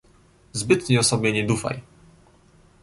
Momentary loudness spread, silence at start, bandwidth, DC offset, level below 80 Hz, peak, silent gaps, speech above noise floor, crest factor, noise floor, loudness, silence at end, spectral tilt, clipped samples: 14 LU; 0.55 s; 11.5 kHz; under 0.1%; -52 dBFS; -4 dBFS; none; 34 dB; 20 dB; -55 dBFS; -22 LUFS; 1 s; -4.5 dB/octave; under 0.1%